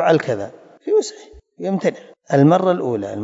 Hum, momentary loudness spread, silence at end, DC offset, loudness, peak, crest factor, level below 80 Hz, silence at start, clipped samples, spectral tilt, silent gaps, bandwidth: none; 16 LU; 0 s; under 0.1%; -18 LUFS; -2 dBFS; 18 dB; -58 dBFS; 0 s; under 0.1%; -7 dB/octave; none; 8 kHz